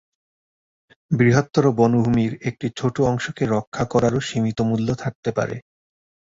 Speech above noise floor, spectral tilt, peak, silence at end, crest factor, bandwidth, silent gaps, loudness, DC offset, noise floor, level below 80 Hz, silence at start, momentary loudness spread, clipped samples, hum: over 70 dB; -7 dB/octave; -2 dBFS; 0.7 s; 18 dB; 7.8 kHz; 3.67-3.72 s, 5.15-5.23 s; -21 LUFS; under 0.1%; under -90 dBFS; -48 dBFS; 1.1 s; 9 LU; under 0.1%; none